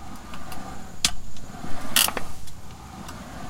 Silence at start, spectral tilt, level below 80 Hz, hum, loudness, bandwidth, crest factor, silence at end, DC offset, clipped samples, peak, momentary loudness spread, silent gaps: 0 s; -1 dB/octave; -42 dBFS; none; -23 LUFS; 17 kHz; 24 dB; 0 s; under 0.1%; under 0.1%; -2 dBFS; 22 LU; none